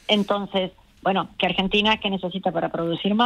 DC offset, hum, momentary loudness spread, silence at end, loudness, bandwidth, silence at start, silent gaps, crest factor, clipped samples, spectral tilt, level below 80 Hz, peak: under 0.1%; none; 7 LU; 0 s; -23 LUFS; 9.8 kHz; 0.1 s; none; 18 dB; under 0.1%; -6 dB/octave; -50 dBFS; -6 dBFS